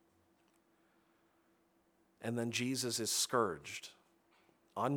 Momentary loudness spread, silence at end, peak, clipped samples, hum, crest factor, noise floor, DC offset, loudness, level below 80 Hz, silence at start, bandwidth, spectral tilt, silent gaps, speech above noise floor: 15 LU; 0 s; -18 dBFS; under 0.1%; none; 22 dB; -74 dBFS; under 0.1%; -37 LUFS; -82 dBFS; 2.2 s; over 20 kHz; -3 dB/octave; none; 37 dB